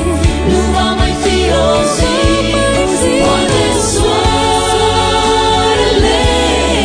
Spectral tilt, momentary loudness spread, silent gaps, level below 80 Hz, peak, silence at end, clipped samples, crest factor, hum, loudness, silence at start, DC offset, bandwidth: -4 dB/octave; 2 LU; none; -20 dBFS; 0 dBFS; 0 s; under 0.1%; 10 dB; none; -11 LUFS; 0 s; under 0.1%; 10 kHz